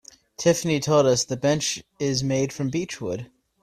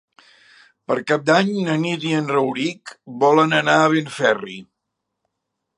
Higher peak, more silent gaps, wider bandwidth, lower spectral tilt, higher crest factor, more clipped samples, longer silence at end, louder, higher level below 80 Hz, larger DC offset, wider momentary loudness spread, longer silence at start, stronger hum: second, -6 dBFS vs 0 dBFS; neither; first, 14 kHz vs 11 kHz; about the same, -4.5 dB/octave vs -5 dB/octave; about the same, 18 dB vs 20 dB; neither; second, 0.4 s vs 1.15 s; second, -23 LUFS vs -19 LUFS; first, -56 dBFS vs -72 dBFS; neither; about the same, 11 LU vs 12 LU; second, 0.4 s vs 0.9 s; neither